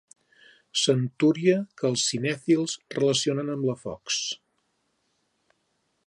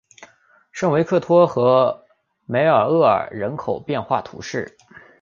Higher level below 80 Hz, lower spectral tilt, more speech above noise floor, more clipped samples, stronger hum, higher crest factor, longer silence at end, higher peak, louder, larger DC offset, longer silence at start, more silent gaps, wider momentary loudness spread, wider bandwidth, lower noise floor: second, -70 dBFS vs -58 dBFS; second, -4 dB/octave vs -6.5 dB/octave; first, 48 dB vs 36 dB; neither; neither; about the same, 20 dB vs 18 dB; first, 1.7 s vs 0.55 s; second, -8 dBFS vs -2 dBFS; second, -25 LUFS vs -19 LUFS; neither; first, 0.75 s vs 0.2 s; neither; second, 7 LU vs 13 LU; first, 11 kHz vs 7.4 kHz; first, -74 dBFS vs -54 dBFS